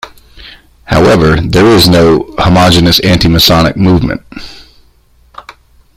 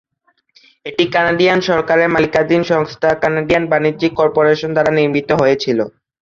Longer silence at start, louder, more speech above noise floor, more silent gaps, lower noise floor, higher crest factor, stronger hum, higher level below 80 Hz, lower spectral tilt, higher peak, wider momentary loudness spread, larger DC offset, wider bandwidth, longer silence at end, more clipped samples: second, 0.05 s vs 0.85 s; first, -7 LUFS vs -14 LUFS; second, 39 dB vs 48 dB; neither; second, -46 dBFS vs -62 dBFS; second, 8 dB vs 14 dB; neither; first, -26 dBFS vs -48 dBFS; about the same, -5.5 dB/octave vs -6 dB/octave; about the same, 0 dBFS vs -2 dBFS; first, 9 LU vs 5 LU; neither; first, over 20 kHz vs 7.6 kHz; about the same, 0.45 s vs 0.35 s; first, 0.2% vs under 0.1%